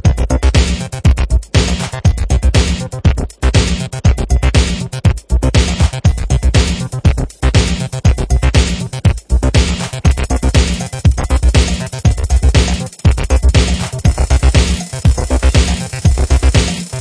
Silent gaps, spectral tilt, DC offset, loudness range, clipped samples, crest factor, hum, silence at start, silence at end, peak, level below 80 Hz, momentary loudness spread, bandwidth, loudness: none; -5 dB/octave; under 0.1%; 1 LU; under 0.1%; 12 dB; none; 0.05 s; 0 s; 0 dBFS; -14 dBFS; 4 LU; 11 kHz; -14 LUFS